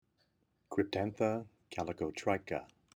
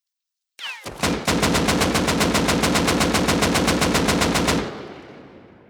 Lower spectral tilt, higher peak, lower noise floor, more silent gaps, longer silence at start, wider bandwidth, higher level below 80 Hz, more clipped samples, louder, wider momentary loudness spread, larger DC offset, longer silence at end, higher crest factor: first, -6 dB/octave vs -3.5 dB/octave; second, -18 dBFS vs -4 dBFS; second, -77 dBFS vs -84 dBFS; neither; about the same, 0.7 s vs 0.6 s; about the same, over 20 kHz vs over 20 kHz; second, -68 dBFS vs -36 dBFS; neither; second, -37 LUFS vs -19 LUFS; second, 8 LU vs 13 LU; neither; about the same, 0.3 s vs 0.3 s; about the same, 20 dB vs 16 dB